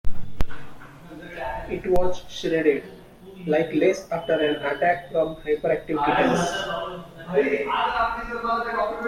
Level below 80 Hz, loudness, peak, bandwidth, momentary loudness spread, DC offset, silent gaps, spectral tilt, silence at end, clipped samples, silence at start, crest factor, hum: -40 dBFS; -24 LUFS; -6 dBFS; 14.5 kHz; 16 LU; under 0.1%; none; -5 dB/octave; 0 s; under 0.1%; 0.05 s; 16 dB; none